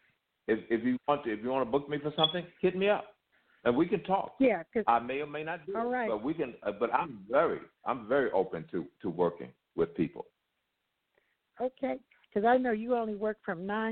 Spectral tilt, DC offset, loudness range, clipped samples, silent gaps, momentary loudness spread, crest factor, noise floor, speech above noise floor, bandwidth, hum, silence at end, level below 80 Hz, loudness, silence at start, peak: -9 dB/octave; under 0.1%; 6 LU; under 0.1%; none; 9 LU; 22 dB; -82 dBFS; 51 dB; 4.5 kHz; none; 0 s; -66 dBFS; -31 LUFS; 0.5 s; -10 dBFS